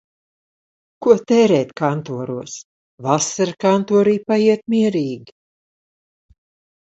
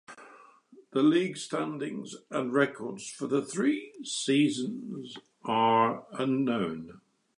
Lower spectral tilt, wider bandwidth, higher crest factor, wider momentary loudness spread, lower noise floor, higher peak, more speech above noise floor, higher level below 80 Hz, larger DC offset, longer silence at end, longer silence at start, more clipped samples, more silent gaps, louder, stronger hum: about the same, -5.5 dB/octave vs -5 dB/octave; second, 8.2 kHz vs 11 kHz; about the same, 18 dB vs 18 dB; about the same, 14 LU vs 16 LU; first, under -90 dBFS vs -57 dBFS; first, 0 dBFS vs -12 dBFS; first, over 73 dB vs 28 dB; first, -64 dBFS vs -76 dBFS; neither; first, 1.6 s vs 0.4 s; first, 1 s vs 0.1 s; neither; first, 2.64-2.98 s vs none; first, -18 LUFS vs -29 LUFS; neither